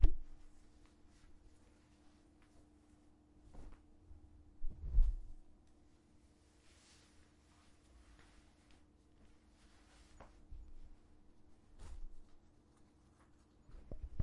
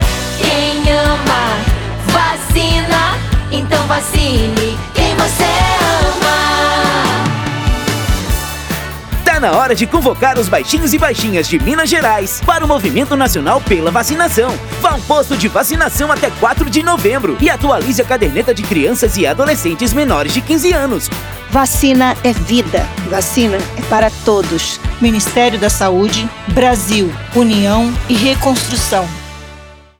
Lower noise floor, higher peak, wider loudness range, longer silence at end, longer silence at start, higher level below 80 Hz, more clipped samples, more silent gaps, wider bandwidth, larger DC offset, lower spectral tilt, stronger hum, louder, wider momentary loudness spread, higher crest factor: first, -68 dBFS vs -36 dBFS; second, -14 dBFS vs 0 dBFS; first, 19 LU vs 1 LU; second, 0 s vs 0.25 s; about the same, 0 s vs 0 s; second, -44 dBFS vs -24 dBFS; neither; neither; second, 5.6 kHz vs over 20 kHz; neither; first, -7 dB/octave vs -4 dB/octave; neither; second, -47 LUFS vs -13 LUFS; first, 17 LU vs 5 LU; first, 28 dB vs 12 dB